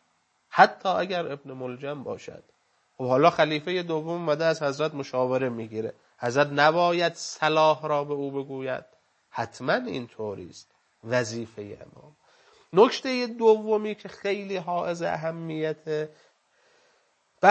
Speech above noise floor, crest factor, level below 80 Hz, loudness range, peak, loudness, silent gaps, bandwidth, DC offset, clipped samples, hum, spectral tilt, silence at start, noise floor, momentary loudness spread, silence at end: 44 dB; 26 dB; -74 dBFS; 7 LU; 0 dBFS; -26 LUFS; none; 8.6 kHz; under 0.1%; under 0.1%; none; -5 dB/octave; 0.5 s; -70 dBFS; 15 LU; 0 s